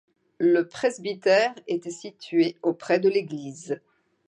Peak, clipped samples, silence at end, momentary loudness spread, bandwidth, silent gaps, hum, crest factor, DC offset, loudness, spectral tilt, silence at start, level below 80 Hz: -8 dBFS; under 0.1%; 0.5 s; 13 LU; 10 kHz; none; none; 16 dB; under 0.1%; -25 LUFS; -5 dB/octave; 0.4 s; -78 dBFS